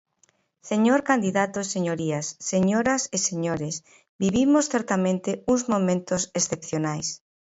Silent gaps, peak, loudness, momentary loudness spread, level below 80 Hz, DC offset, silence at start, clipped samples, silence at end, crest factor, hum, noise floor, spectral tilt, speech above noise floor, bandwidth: 4.09-4.19 s; -6 dBFS; -24 LUFS; 8 LU; -58 dBFS; under 0.1%; 0.65 s; under 0.1%; 0.4 s; 20 dB; none; -66 dBFS; -4.5 dB/octave; 42 dB; 8 kHz